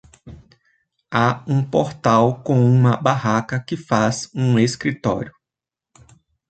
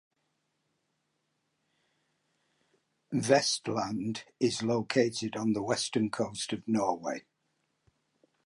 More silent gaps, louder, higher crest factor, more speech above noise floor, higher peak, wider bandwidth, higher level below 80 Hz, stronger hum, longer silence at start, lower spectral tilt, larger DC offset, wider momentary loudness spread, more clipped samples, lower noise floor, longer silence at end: neither; first, -19 LUFS vs -31 LUFS; second, 18 dB vs 24 dB; first, 69 dB vs 49 dB; first, -2 dBFS vs -10 dBFS; second, 9 kHz vs 11.5 kHz; first, -52 dBFS vs -72 dBFS; neither; second, 0.25 s vs 3.1 s; first, -6.5 dB/octave vs -4 dB/octave; neither; about the same, 8 LU vs 10 LU; neither; first, -87 dBFS vs -79 dBFS; about the same, 1.2 s vs 1.25 s